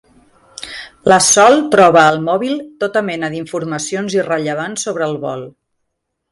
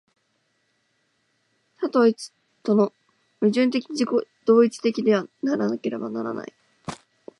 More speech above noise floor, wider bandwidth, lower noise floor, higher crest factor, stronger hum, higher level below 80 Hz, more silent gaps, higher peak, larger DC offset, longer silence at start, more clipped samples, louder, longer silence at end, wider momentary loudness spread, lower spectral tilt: first, 59 dB vs 49 dB; about the same, 11.5 kHz vs 11.5 kHz; about the same, -73 dBFS vs -70 dBFS; about the same, 16 dB vs 20 dB; neither; first, -56 dBFS vs -72 dBFS; neither; first, 0 dBFS vs -6 dBFS; neither; second, 0.6 s vs 1.8 s; neither; first, -14 LUFS vs -23 LUFS; first, 0.85 s vs 0.45 s; second, 16 LU vs 19 LU; second, -3.5 dB/octave vs -6 dB/octave